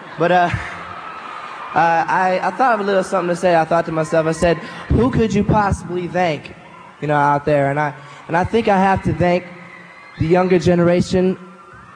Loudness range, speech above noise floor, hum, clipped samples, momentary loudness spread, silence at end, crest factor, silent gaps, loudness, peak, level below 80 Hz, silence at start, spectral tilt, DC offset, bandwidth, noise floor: 2 LU; 23 dB; none; under 0.1%; 15 LU; 0 s; 16 dB; none; -17 LUFS; -2 dBFS; -38 dBFS; 0 s; -6.5 dB/octave; under 0.1%; 10.5 kHz; -39 dBFS